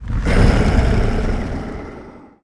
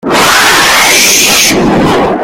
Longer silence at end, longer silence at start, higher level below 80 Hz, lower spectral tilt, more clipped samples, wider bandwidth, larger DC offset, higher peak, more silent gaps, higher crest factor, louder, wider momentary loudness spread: first, 0.25 s vs 0 s; about the same, 0 s vs 0.05 s; first, -20 dBFS vs -32 dBFS; first, -7 dB/octave vs -1.5 dB/octave; second, under 0.1% vs 2%; second, 11 kHz vs over 20 kHz; neither; about the same, 0 dBFS vs 0 dBFS; neither; first, 16 dB vs 6 dB; second, -18 LUFS vs -4 LUFS; first, 18 LU vs 5 LU